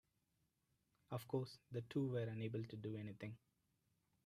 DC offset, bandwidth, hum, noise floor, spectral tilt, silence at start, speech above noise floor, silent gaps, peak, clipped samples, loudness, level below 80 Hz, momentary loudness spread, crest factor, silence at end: under 0.1%; 13.5 kHz; none; -85 dBFS; -8 dB/octave; 1.1 s; 39 dB; none; -30 dBFS; under 0.1%; -47 LUFS; -82 dBFS; 10 LU; 20 dB; 0.9 s